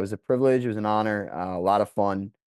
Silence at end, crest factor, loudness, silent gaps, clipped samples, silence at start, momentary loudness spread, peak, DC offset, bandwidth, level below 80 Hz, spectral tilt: 0.25 s; 16 dB; -25 LUFS; none; under 0.1%; 0 s; 7 LU; -10 dBFS; under 0.1%; 12.5 kHz; -68 dBFS; -7.5 dB/octave